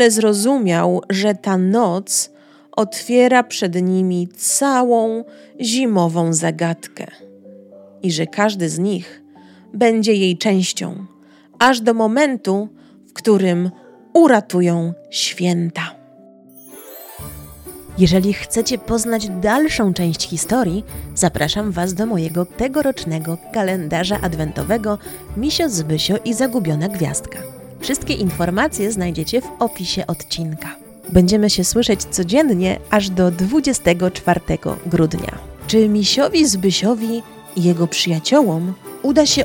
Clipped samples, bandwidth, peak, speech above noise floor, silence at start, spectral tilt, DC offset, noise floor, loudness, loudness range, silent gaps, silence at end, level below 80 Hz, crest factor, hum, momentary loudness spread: under 0.1%; 17.5 kHz; 0 dBFS; 28 dB; 0 s; -4.5 dB/octave; under 0.1%; -45 dBFS; -17 LUFS; 4 LU; none; 0 s; -40 dBFS; 18 dB; none; 13 LU